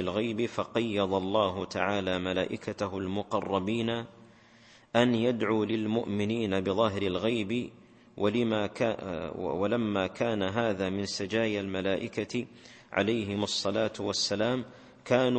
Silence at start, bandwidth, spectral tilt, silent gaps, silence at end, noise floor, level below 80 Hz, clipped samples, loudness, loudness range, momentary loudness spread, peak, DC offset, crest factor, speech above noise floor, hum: 0 s; 8.8 kHz; -5 dB/octave; none; 0 s; -57 dBFS; -64 dBFS; under 0.1%; -30 LUFS; 2 LU; 7 LU; -8 dBFS; under 0.1%; 22 dB; 28 dB; none